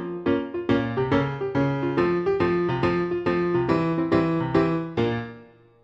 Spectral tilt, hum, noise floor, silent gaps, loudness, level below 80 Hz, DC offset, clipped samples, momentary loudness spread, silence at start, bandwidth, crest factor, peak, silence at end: -8.5 dB/octave; none; -49 dBFS; none; -24 LUFS; -50 dBFS; under 0.1%; under 0.1%; 3 LU; 0 s; 7.6 kHz; 16 dB; -6 dBFS; 0.4 s